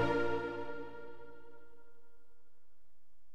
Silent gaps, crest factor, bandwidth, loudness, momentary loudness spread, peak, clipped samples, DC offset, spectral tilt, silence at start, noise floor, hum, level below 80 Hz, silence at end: none; 20 dB; 10 kHz; -39 LUFS; 24 LU; -20 dBFS; under 0.1%; 0.7%; -7 dB/octave; 0 s; -76 dBFS; none; -62 dBFS; 1.25 s